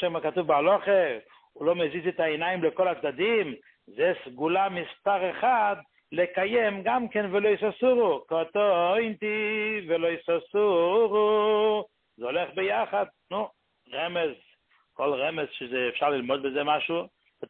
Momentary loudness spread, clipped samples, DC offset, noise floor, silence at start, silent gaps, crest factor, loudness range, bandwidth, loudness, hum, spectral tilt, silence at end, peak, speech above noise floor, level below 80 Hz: 10 LU; under 0.1%; under 0.1%; -65 dBFS; 0 s; none; 16 dB; 5 LU; 4.3 kHz; -26 LUFS; none; -9 dB/octave; 0.05 s; -10 dBFS; 39 dB; -70 dBFS